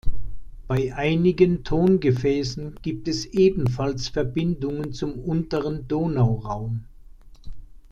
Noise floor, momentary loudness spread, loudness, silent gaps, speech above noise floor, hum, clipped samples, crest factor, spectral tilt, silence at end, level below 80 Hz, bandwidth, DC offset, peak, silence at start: -44 dBFS; 11 LU; -24 LUFS; none; 22 dB; none; under 0.1%; 18 dB; -7 dB/octave; 0.15 s; -36 dBFS; 7.6 kHz; under 0.1%; -4 dBFS; 0.05 s